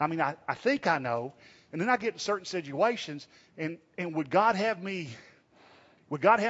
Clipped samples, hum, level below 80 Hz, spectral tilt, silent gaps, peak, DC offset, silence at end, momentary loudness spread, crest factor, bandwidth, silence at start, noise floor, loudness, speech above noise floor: under 0.1%; none; -76 dBFS; -5 dB/octave; none; -8 dBFS; under 0.1%; 0 s; 16 LU; 22 dB; 8 kHz; 0 s; -59 dBFS; -30 LUFS; 30 dB